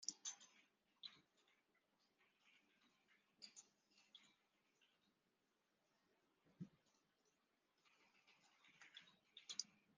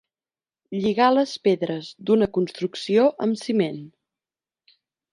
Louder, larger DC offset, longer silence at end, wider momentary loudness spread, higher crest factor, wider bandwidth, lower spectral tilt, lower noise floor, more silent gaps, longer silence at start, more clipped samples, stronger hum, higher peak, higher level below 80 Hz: second, -57 LUFS vs -22 LUFS; neither; second, 0.05 s vs 1.25 s; first, 17 LU vs 10 LU; first, 36 dB vs 18 dB; second, 7.2 kHz vs 11 kHz; second, -1.5 dB/octave vs -6 dB/octave; about the same, -87 dBFS vs under -90 dBFS; neither; second, 0 s vs 0.7 s; neither; neither; second, -28 dBFS vs -6 dBFS; second, under -90 dBFS vs -64 dBFS